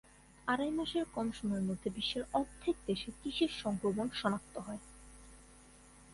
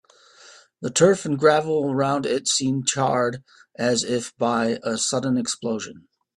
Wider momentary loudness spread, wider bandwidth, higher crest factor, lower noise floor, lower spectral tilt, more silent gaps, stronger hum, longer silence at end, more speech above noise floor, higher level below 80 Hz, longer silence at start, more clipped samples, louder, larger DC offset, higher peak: first, 19 LU vs 9 LU; about the same, 11.5 kHz vs 12.5 kHz; about the same, 20 dB vs 20 dB; first, -59 dBFS vs -50 dBFS; about the same, -5 dB/octave vs -4 dB/octave; neither; neither; second, 0 s vs 0.35 s; second, 23 dB vs 28 dB; about the same, -60 dBFS vs -64 dBFS; about the same, 0.45 s vs 0.5 s; neither; second, -37 LUFS vs -22 LUFS; neither; second, -18 dBFS vs -2 dBFS